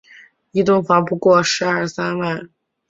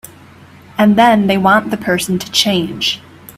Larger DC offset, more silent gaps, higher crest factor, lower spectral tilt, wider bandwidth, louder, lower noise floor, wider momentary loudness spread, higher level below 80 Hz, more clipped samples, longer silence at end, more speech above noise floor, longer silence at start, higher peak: neither; neither; about the same, 16 dB vs 14 dB; about the same, -5 dB/octave vs -4 dB/octave; second, 7.8 kHz vs 15.5 kHz; second, -17 LUFS vs -13 LUFS; first, -47 dBFS vs -40 dBFS; about the same, 10 LU vs 8 LU; second, -58 dBFS vs -52 dBFS; neither; first, 0.45 s vs 0.05 s; about the same, 30 dB vs 27 dB; second, 0.55 s vs 0.75 s; about the same, -2 dBFS vs 0 dBFS